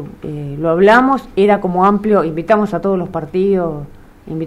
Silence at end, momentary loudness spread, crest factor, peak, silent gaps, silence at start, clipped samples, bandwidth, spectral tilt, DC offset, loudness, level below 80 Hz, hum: 0 s; 16 LU; 14 dB; 0 dBFS; none; 0 s; under 0.1%; 11 kHz; -8 dB/octave; under 0.1%; -14 LUFS; -42 dBFS; none